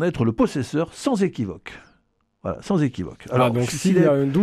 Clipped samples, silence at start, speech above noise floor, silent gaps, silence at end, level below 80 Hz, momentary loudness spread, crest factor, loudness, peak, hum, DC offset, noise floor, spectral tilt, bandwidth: under 0.1%; 0 s; 45 dB; none; 0 s; -50 dBFS; 14 LU; 18 dB; -22 LUFS; -4 dBFS; none; under 0.1%; -66 dBFS; -6.5 dB/octave; 14.5 kHz